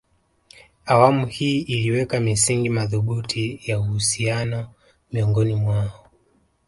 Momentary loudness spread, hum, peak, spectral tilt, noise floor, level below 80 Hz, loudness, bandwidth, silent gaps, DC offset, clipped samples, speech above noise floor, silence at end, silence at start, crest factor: 10 LU; none; 0 dBFS; -5 dB/octave; -63 dBFS; -48 dBFS; -21 LUFS; 11.5 kHz; none; under 0.1%; under 0.1%; 42 dB; 0.7 s; 0.85 s; 22 dB